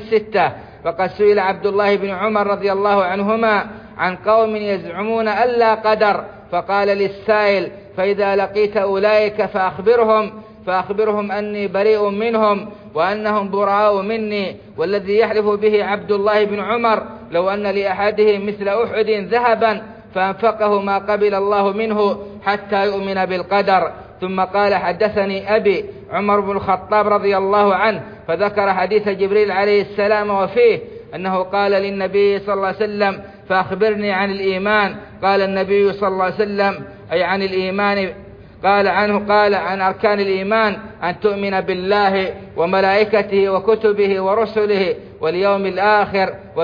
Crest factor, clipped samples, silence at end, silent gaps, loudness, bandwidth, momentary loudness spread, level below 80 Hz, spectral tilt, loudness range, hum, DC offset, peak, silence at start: 14 dB; under 0.1%; 0 s; none; -17 LUFS; 5.2 kHz; 7 LU; -52 dBFS; -7.5 dB/octave; 2 LU; none; under 0.1%; -4 dBFS; 0 s